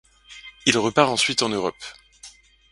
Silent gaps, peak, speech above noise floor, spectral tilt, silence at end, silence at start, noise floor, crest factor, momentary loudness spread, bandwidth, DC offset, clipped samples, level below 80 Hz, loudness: none; 0 dBFS; 27 dB; -3 dB/octave; 0.45 s; 0.3 s; -48 dBFS; 24 dB; 21 LU; 11.5 kHz; under 0.1%; under 0.1%; -58 dBFS; -21 LUFS